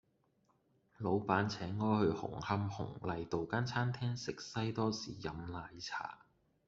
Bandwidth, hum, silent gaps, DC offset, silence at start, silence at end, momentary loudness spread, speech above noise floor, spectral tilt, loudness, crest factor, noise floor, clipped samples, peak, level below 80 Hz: 7.8 kHz; none; none; under 0.1%; 1 s; 0.5 s; 10 LU; 38 dB; -5.5 dB/octave; -38 LUFS; 22 dB; -76 dBFS; under 0.1%; -16 dBFS; -66 dBFS